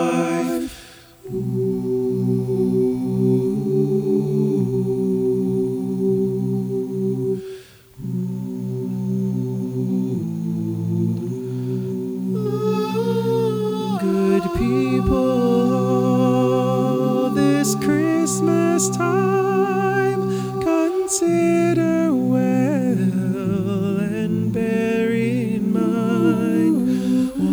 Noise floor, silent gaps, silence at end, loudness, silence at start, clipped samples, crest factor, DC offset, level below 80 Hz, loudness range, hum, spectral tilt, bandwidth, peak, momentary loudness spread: -43 dBFS; none; 0 s; -20 LUFS; 0 s; under 0.1%; 14 dB; under 0.1%; -44 dBFS; 6 LU; none; -6.5 dB/octave; over 20 kHz; -6 dBFS; 7 LU